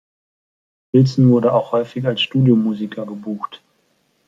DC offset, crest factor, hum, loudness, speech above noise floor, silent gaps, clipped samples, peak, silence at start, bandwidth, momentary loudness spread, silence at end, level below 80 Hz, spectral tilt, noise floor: under 0.1%; 16 dB; none; -17 LUFS; 47 dB; none; under 0.1%; -2 dBFS; 0.95 s; 7.4 kHz; 14 LU; 0.7 s; -62 dBFS; -8 dB/octave; -63 dBFS